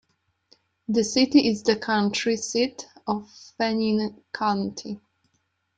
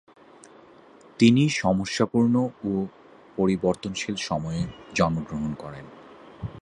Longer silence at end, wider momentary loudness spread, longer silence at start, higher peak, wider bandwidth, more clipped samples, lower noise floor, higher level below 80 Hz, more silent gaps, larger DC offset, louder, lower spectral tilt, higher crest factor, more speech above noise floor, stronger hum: first, 0.8 s vs 0 s; second, 15 LU vs 19 LU; second, 0.9 s vs 1.2 s; about the same, -6 dBFS vs -4 dBFS; second, 9.2 kHz vs 10.5 kHz; neither; first, -73 dBFS vs -51 dBFS; second, -64 dBFS vs -50 dBFS; neither; neither; about the same, -24 LUFS vs -25 LUFS; second, -4 dB/octave vs -6 dB/octave; about the same, 20 dB vs 22 dB; first, 49 dB vs 27 dB; neither